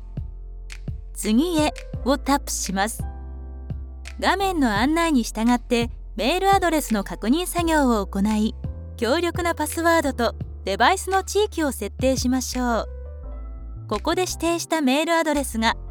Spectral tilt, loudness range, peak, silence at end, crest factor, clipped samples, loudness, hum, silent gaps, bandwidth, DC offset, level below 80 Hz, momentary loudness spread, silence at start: -4 dB/octave; 3 LU; -6 dBFS; 0 s; 18 dB; under 0.1%; -22 LUFS; none; none; 19.5 kHz; under 0.1%; -36 dBFS; 16 LU; 0 s